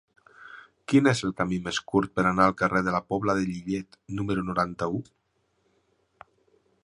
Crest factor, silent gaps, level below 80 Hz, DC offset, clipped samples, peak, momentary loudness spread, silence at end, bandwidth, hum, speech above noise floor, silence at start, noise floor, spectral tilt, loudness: 22 dB; none; -54 dBFS; under 0.1%; under 0.1%; -6 dBFS; 14 LU; 1.8 s; 11 kHz; none; 46 dB; 0.4 s; -71 dBFS; -6 dB/octave; -26 LUFS